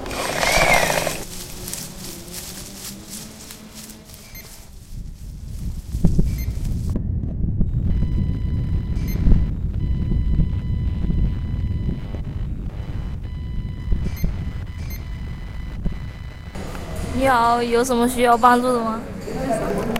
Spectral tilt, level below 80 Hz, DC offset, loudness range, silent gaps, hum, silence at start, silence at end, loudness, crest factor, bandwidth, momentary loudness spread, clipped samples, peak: -5 dB/octave; -26 dBFS; under 0.1%; 14 LU; none; none; 0 s; 0 s; -23 LUFS; 22 dB; 16.5 kHz; 19 LU; under 0.1%; 0 dBFS